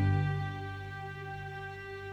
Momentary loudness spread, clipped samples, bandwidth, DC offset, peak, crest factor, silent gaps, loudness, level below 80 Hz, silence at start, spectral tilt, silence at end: 11 LU; under 0.1%; 7 kHz; under 0.1%; -18 dBFS; 16 dB; none; -37 LUFS; -56 dBFS; 0 s; -8 dB/octave; 0 s